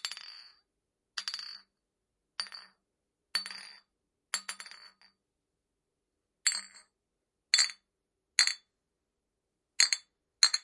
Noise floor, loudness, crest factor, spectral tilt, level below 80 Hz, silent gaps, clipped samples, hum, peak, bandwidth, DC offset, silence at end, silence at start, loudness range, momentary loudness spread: -85 dBFS; -31 LUFS; 34 dB; 5 dB/octave; -90 dBFS; none; under 0.1%; none; -4 dBFS; 11.5 kHz; under 0.1%; 0.05 s; 0.05 s; 11 LU; 22 LU